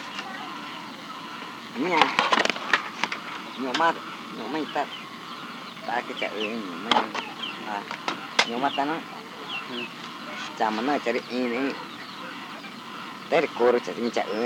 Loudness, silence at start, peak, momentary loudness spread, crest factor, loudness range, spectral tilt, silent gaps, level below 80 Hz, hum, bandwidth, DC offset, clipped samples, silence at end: -28 LUFS; 0 s; 0 dBFS; 14 LU; 28 dB; 5 LU; -3 dB/octave; none; -78 dBFS; none; 17 kHz; under 0.1%; under 0.1%; 0 s